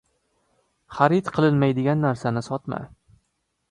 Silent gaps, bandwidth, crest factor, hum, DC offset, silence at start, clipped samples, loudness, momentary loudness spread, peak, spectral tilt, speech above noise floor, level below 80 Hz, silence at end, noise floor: none; 10 kHz; 22 dB; none; under 0.1%; 0.9 s; under 0.1%; -22 LUFS; 14 LU; -2 dBFS; -8 dB/octave; 53 dB; -58 dBFS; 0.85 s; -74 dBFS